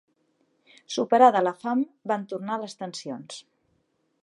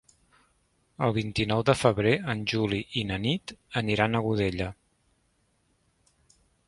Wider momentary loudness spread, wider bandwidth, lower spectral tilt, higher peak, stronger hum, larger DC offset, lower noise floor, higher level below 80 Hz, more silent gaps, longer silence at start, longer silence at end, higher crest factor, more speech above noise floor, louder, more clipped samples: first, 19 LU vs 8 LU; about the same, 11 kHz vs 11.5 kHz; second, -4.5 dB/octave vs -6 dB/octave; about the same, -4 dBFS vs -6 dBFS; neither; neither; about the same, -71 dBFS vs -70 dBFS; second, -82 dBFS vs -52 dBFS; neither; about the same, 0.9 s vs 1 s; second, 0.8 s vs 1.95 s; about the same, 22 dB vs 22 dB; about the same, 47 dB vs 44 dB; about the same, -25 LUFS vs -27 LUFS; neither